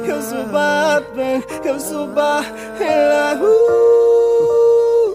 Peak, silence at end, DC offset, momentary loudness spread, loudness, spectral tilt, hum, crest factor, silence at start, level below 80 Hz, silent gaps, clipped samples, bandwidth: -4 dBFS; 0 s; under 0.1%; 10 LU; -15 LUFS; -4 dB/octave; none; 12 dB; 0 s; -54 dBFS; none; under 0.1%; 16 kHz